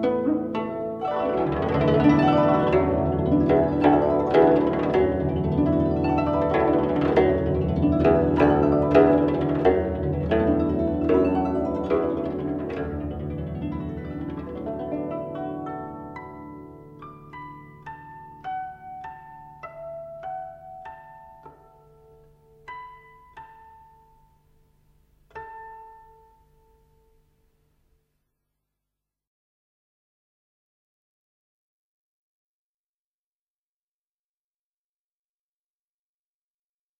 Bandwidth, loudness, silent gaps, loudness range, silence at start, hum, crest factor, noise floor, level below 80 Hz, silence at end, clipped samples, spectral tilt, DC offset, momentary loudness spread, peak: 6 kHz; -23 LUFS; none; 19 LU; 0 s; none; 22 dB; under -90 dBFS; -42 dBFS; 11.05 s; under 0.1%; -9.5 dB/octave; under 0.1%; 22 LU; -4 dBFS